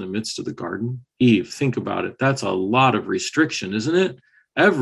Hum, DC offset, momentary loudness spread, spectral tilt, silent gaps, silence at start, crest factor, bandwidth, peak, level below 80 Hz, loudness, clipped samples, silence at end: none; under 0.1%; 11 LU; -5.5 dB/octave; none; 0 s; 16 dB; 12 kHz; -4 dBFS; -58 dBFS; -21 LUFS; under 0.1%; 0 s